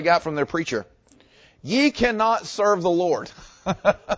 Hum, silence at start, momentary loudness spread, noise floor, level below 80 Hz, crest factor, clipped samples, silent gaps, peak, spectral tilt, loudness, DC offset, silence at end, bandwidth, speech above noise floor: none; 0 s; 11 LU; -55 dBFS; -50 dBFS; 18 dB; under 0.1%; none; -6 dBFS; -5 dB/octave; -22 LUFS; under 0.1%; 0 s; 8 kHz; 34 dB